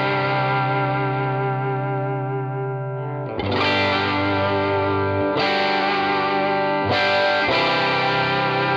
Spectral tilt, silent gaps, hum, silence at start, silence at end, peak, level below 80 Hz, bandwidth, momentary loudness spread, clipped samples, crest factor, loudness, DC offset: -6.5 dB/octave; none; none; 0 s; 0 s; -8 dBFS; -54 dBFS; 7.6 kHz; 8 LU; under 0.1%; 12 dB; -20 LUFS; under 0.1%